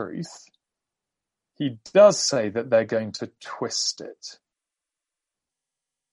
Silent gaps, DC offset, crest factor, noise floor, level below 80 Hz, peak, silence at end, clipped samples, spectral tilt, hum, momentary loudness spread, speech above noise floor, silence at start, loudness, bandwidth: none; under 0.1%; 22 dB; -87 dBFS; -74 dBFS; -4 dBFS; 1.8 s; under 0.1%; -3.5 dB/octave; none; 22 LU; 64 dB; 0 s; -22 LUFS; 11.5 kHz